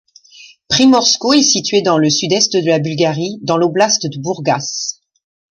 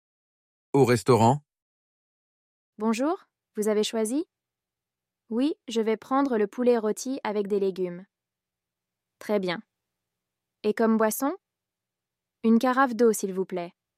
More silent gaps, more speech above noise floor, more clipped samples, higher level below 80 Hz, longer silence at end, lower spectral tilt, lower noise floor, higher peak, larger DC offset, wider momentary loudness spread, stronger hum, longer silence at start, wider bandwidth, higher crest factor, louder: second, none vs 1.62-2.73 s; second, 29 dB vs 65 dB; neither; first, -56 dBFS vs -72 dBFS; first, 0.6 s vs 0.3 s; second, -3.5 dB/octave vs -5.5 dB/octave; second, -42 dBFS vs -89 dBFS; first, 0 dBFS vs -8 dBFS; neither; about the same, 10 LU vs 12 LU; neither; second, 0.4 s vs 0.75 s; second, 10.5 kHz vs 15.5 kHz; second, 14 dB vs 20 dB; first, -13 LUFS vs -26 LUFS